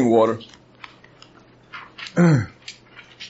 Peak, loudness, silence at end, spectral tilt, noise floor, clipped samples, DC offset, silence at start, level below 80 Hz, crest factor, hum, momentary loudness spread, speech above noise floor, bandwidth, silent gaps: -4 dBFS; -20 LUFS; 0 s; -7 dB/octave; -50 dBFS; under 0.1%; under 0.1%; 0 s; -60 dBFS; 18 dB; none; 26 LU; 32 dB; 8 kHz; none